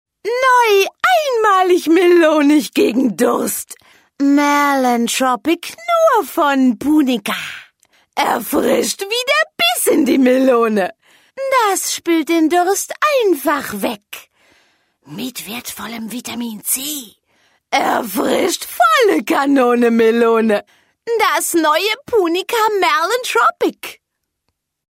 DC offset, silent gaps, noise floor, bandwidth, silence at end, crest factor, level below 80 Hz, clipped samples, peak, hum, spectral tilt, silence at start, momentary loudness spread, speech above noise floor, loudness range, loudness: under 0.1%; none; -72 dBFS; 16.5 kHz; 1.05 s; 12 dB; -60 dBFS; under 0.1%; -2 dBFS; none; -2.5 dB/octave; 0.25 s; 13 LU; 57 dB; 7 LU; -15 LUFS